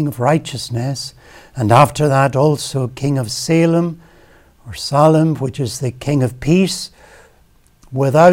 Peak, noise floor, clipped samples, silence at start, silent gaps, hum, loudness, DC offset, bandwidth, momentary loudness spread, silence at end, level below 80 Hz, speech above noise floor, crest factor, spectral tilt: 0 dBFS; -52 dBFS; under 0.1%; 0 s; none; none; -16 LUFS; under 0.1%; 17 kHz; 14 LU; 0 s; -46 dBFS; 37 dB; 16 dB; -6 dB/octave